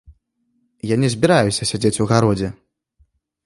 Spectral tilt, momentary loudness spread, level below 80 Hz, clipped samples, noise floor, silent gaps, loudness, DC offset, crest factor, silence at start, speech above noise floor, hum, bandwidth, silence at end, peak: -5.5 dB/octave; 9 LU; -46 dBFS; under 0.1%; -67 dBFS; none; -18 LUFS; under 0.1%; 20 dB; 0.85 s; 50 dB; none; 11.5 kHz; 0.95 s; 0 dBFS